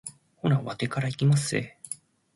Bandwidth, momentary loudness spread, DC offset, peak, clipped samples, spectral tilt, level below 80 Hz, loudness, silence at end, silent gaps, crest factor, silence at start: 11.5 kHz; 15 LU; under 0.1%; -12 dBFS; under 0.1%; -5.5 dB/octave; -62 dBFS; -27 LUFS; 0.4 s; none; 16 dB; 0.05 s